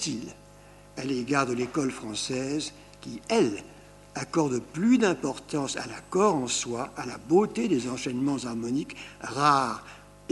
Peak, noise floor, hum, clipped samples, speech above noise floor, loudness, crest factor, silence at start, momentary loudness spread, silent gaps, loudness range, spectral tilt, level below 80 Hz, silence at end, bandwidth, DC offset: -8 dBFS; -51 dBFS; 50 Hz at -55 dBFS; under 0.1%; 24 dB; -28 LUFS; 20 dB; 0 s; 16 LU; none; 3 LU; -4.5 dB/octave; -58 dBFS; 0.05 s; 12 kHz; under 0.1%